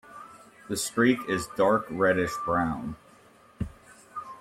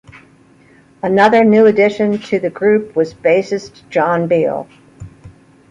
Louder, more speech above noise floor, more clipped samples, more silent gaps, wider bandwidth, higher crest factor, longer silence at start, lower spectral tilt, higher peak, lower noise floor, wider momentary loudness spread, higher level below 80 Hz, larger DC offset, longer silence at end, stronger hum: second, -26 LUFS vs -14 LUFS; second, 30 dB vs 34 dB; neither; neither; first, 16.5 kHz vs 7.8 kHz; first, 20 dB vs 14 dB; second, 0.05 s vs 1.05 s; second, -5 dB/octave vs -7 dB/octave; second, -10 dBFS vs 0 dBFS; first, -56 dBFS vs -47 dBFS; first, 20 LU vs 12 LU; about the same, -54 dBFS vs -52 dBFS; neither; second, 0 s vs 0.4 s; neither